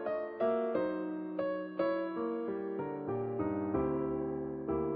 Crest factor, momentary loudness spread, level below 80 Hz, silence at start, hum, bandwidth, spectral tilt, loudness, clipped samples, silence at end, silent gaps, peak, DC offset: 16 dB; 5 LU; -60 dBFS; 0 s; none; 4.8 kHz; -7 dB/octave; -36 LUFS; under 0.1%; 0 s; none; -18 dBFS; under 0.1%